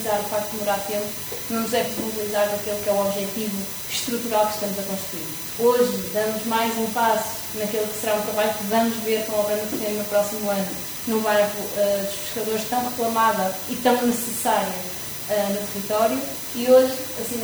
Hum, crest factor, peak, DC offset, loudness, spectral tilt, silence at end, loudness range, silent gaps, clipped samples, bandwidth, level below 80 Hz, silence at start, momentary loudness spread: none; 18 dB; -4 dBFS; under 0.1%; -23 LUFS; -3.5 dB/octave; 0 s; 2 LU; none; under 0.1%; over 20 kHz; -58 dBFS; 0 s; 7 LU